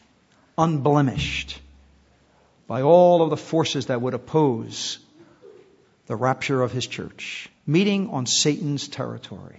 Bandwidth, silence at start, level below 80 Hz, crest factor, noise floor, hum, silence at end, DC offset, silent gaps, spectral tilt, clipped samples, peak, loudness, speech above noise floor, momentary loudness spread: 8 kHz; 0.6 s; -52 dBFS; 20 dB; -59 dBFS; none; 0.1 s; under 0.1%; none; -5 dB/octave; under 0.1%; -2 dBFS; -22 LUFS; 37 dB; 15 LU